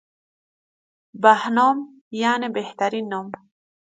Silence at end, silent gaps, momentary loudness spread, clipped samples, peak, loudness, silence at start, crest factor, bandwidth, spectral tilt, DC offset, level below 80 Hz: 0.65 s; 2.01-2.11 s; 16 LU; under 0.1%; -2 dBFS; -21 LUFS; 1.15 s; 20 dB; 9.2 kHz; -4.5 dB/octave; under 0.1%; -76 dBFS